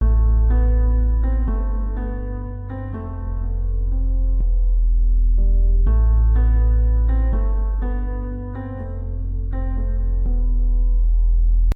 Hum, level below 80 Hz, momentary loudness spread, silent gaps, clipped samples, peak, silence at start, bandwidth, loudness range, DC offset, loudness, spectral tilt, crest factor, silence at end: none; -18 dBFS; 11 LU; none; under 0.1%; -8 dBFS; 0 s; 2 kHz; 6 LU; under 0.1%; -22 LUFS; -11 dB/octave; 8 dB; 0 s